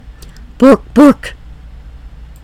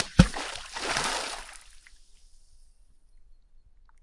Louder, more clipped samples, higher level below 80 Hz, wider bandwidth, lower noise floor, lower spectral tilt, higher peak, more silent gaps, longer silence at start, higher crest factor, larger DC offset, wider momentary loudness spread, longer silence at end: first, -9 LUFS vs -28 LUFS; first, 4% vs under 0.1%; first, -32 dBFS vs -40 dBFS; first, 13.5 kHz vs 11.5 kHz; second, -33 dBFS vs -56 dBFS; first, -6.5 dB/octave vs -4.5 dB/octave; about the same, 0 dBFS vs -2 dBFS; neither; first, 0.6 s vs 0 s; second, 12 dB vs 30 dB; neither; second, 13 LU vs 20 LU; first, 1.15 s vs 0.7 s